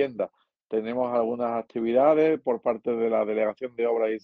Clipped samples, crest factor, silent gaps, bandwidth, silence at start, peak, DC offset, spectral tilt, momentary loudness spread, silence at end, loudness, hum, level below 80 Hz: under 0.1%; 18 dB; none; 5 kHz; 0 s; -8 dBFS; under 0.1%; -8.5 dB/octave; 9 LU; 0.05 s; -26 LUFS; none; -72 dBFS